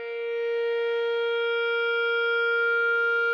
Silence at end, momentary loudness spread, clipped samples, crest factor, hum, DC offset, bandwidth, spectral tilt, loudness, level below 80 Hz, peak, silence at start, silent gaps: 0 s; 5 LU; under 0.1%; 8 dB; 50 Hz at -85 dBFS; under 0.1%; 6 kHz; 0 dB/octave; -25 LUFS; under -90 dBFS; -16 dBFS; 0 s; none